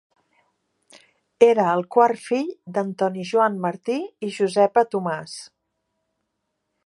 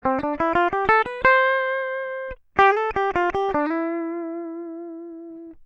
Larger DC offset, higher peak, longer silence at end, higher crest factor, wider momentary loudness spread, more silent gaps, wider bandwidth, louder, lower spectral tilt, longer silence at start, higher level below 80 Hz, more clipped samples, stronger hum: neither; about the same, -2 dBFS vs -2 dBFS; first, 1.4 s vs 0 s; about the same, 22 dB vs 20 dB; second, 11 LU vs 18 LU; neither; first, 11.5 kHz vs 7.8 kHz; about the same, -21 LUFS vs -21 LUFS; about the same, -5.5 dB/octave vs -6 dB/octave; first, 1.4 s vs 0.05 s; second, -76 dBFS vs -48 dBFS; neither; neither